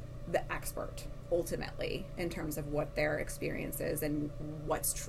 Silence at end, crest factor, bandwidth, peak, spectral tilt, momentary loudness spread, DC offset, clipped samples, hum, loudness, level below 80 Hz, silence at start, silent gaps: 0 s; 18 dB; 16 kHz; -18 dBFS; -4.5 dB/octave; 7 LU; under 0.1%; under 0.1%; none; -37 LUFS; -46 dBFS; 0 s; none